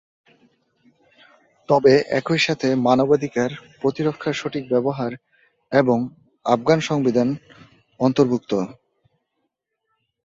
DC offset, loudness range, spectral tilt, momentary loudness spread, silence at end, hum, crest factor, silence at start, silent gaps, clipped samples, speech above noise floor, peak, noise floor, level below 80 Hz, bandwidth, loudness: under 0.1%; 4 LU; -6 dB/octave; 10 LU; 1.5 s; none; 20 dB; 1.7 s; none; under 0.1%; 56 dB; -2 dBFS; -76 dBFS; -62 dBFS; 7.8 kHz; -20 LUFS